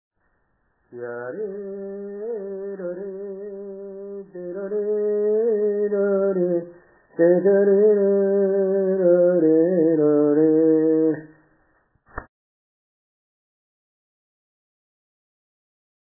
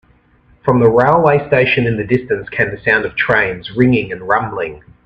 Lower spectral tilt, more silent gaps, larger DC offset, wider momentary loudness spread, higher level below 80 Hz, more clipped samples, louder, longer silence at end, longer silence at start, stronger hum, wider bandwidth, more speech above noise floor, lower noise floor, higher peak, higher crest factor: first, -15 dB/octave vs -8.5 dB/octave; neither; neither; first, 19 LU vs 9 LU; second, -62 dBFS vs -44 dBFS; neither; second, -20 LUFS vs -14 LUFS; first, 3.8 s vs 0.25 s; first, 0.9 s vs 0.65 s; neither; second, 2 kHz vs 6 kHz; first, 49 dB vs 37 dB; first, -68 dBFS vs -51 dBFS; second, -6 dBFS vs 0 dBFS; about the same, 16 dB vs 14 dB